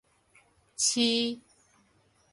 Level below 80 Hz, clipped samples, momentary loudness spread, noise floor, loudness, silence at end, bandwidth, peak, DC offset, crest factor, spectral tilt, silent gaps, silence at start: -74 dBFS; under 0.1%; 20 LU; -67 dBFS; -27 LUFS; 0.95 s; 11.5 kHz; -12 dBFS; under 0.1%; 20 dB; -1 dB/octave; none; 0.8 s